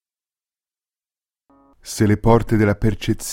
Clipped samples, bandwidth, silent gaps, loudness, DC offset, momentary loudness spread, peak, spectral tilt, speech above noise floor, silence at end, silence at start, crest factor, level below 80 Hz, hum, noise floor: under 0.1%; 16.5 kHz; none; -18 LUFS; under 0.1%; 8 LU; -2 dBFS; -6.5 dB/octave; over 73 dB; 0 s; 1.85 s; 20 dB; -34 dBFS; none; under -90 dBFS